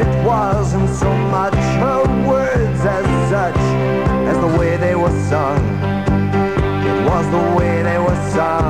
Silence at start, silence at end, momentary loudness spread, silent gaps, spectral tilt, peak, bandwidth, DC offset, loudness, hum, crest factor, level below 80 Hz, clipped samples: 0 s; 0 s; 2 LU; none; -7.5 dB/octave; -4 dBFS; 10.5 kHz; 1%; -16 LUFS; none; 12 dB; -28 dBFS; under 0.1%